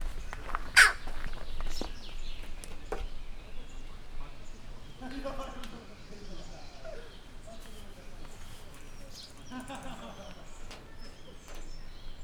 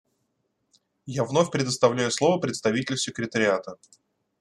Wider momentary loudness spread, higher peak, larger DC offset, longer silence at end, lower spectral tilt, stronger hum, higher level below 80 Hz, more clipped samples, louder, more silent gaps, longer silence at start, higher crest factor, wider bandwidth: first, 11 LU vs 8 LU; about the same, -6 dBFS vs -4 dBFS; neither; second, 0 s vs 0.65 s; second, -1.5 dB/octave vs -4.5 dB/octave; neither; first, -40 dBFS vs -66 dBFS; neither; second, -30 LUFS vs -25 LUFS; neither; second, 0 s vs 1.05 s; first, 30 dB vs 22 dB; first, 16.5 kHz vs 12.5 kHz